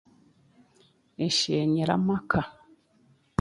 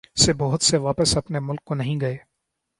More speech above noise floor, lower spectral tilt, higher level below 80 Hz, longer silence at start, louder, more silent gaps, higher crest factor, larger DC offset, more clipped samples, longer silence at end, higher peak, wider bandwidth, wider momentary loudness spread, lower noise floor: second, 38 dB vs 56 dB; about the same, -5 dB/octave vs -4 dB/octave; second, -56 dBFS vs -44 dBFS; first, 1.2 s vs 0.15 s; second, -26 LUFS vs -21 LUFS; neither; about the same, 22 dB vs 20 dB; neither; neither; first, 0.9 s vs 0.6 s; second, -8 dBFS vs -2 dBFS; about the same, 11.5 kHz vs 11.5 kHz; about the same, 9 LU vs 10 LU; second, -63 dBFS vs -79 dBFS